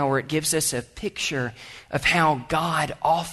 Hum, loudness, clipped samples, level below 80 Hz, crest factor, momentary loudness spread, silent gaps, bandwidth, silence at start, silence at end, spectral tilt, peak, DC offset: none; -24 LUFS; under 0.1%; -50 dBFS; 16 dB; 11 LU; none; 12.5 kHz; 0 s; 0 s; -3.5 dB/octave; -8 dBFS; under 0.1%